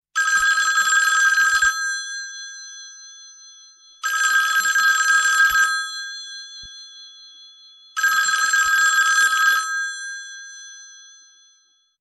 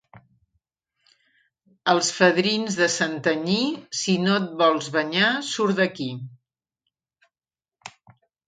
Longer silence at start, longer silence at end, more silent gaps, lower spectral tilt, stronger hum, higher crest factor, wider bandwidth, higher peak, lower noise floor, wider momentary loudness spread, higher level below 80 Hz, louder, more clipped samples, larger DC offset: about the same, 0.15 s vs 0.15 s; first, 1.05 s vs 0.6 s; neither; second, 4.5 dB/octave vs -3.5 dB/octave; neither; second, 14 dB vs 22 dB; first, 14 kHz vs 9.6 kHz; about the same, -6 dBFS vs -4 dBFS; second, -60 dBFS vs under -90 dBFS; first, 21 LU vs 18 LU; first, -60 dBFS vs -70 dBFS; first, -17 LUFS vs -22 LUFS; neither; neither